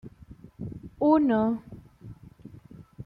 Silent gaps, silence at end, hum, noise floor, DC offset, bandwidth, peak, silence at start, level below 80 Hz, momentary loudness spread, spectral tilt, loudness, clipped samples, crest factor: none; 0 s; none; -50 dBFS; under 0.1%; 4.9 kHz; -10 dBFS; 0.05 s; -56 dBFS; 26 LU; -9.5 dB/octave; -24 LUFS; under 0.1%; 20 dB